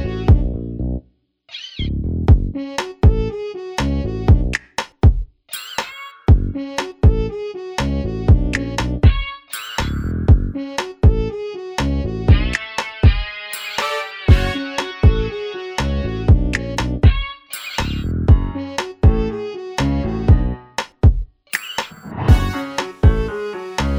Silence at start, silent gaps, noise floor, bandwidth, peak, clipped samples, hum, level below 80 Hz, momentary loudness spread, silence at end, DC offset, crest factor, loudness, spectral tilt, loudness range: 0 s; none; -54 dBFS; 19 kHz; 0 dBFS; under 0.1%; none; -20 dBFS; 11 LU; 0 s; under 0.1%; 16 dB; -19 LUFS; -6.5 dB/octave; 2 LU